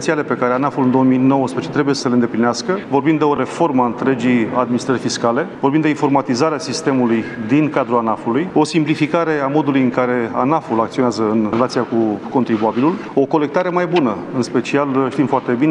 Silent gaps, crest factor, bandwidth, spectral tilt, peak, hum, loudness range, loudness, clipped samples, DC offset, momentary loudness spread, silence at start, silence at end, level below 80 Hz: none; 16 dB; 10.5 kHz; -6 dB/octave; 0 dBFS; none; 1 LU; -17 LUFS; under 0.1%; under 0.1%; 3 LU; 0 s; 0 s; -58 dBFS